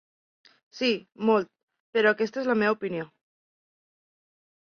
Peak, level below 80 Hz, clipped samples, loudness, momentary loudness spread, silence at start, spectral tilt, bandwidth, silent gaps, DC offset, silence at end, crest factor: -8 dBFS; -74 dBFS; under 0.1%; -26 LUFS; 11 LU; 0.75 s; -5.5 dB/octave; 6.8 kHz; 1.63-1.68 s, 1.80-1.93 s; under 0.1%; 1.6 s; 20 dB